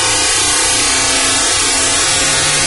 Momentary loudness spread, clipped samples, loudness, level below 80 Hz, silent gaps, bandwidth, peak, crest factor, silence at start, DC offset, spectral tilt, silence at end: 0 LU; under 0.1%; -10 LUFS; -34 dBFS; none; 11.5 kHz; -2 dBFS; 12 dB; 0 s; under 0.1%; 0 dB/octave; 0 s